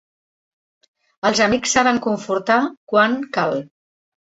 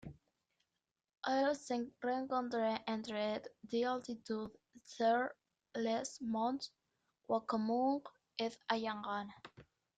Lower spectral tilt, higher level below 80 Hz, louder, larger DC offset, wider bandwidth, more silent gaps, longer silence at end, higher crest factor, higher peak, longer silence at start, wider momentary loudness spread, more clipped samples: second, -3 dB/octave vs -4.5 dB/octave; first, -56 dBFS vs -78 dBFS; first, -18 LUFS vs -39 LUFS; neither; second, 8 kHz vs 9.2 kHz; first, 2.77-2.87 s vs none; first, 0.6 s vs 0.35 s; about the same, 20 dB vs 20 dB; first, -2 dBFS vs -20 dBFS; first, 1.25 s vs 0.05 s; second, 6 LU vs 13 LU; neither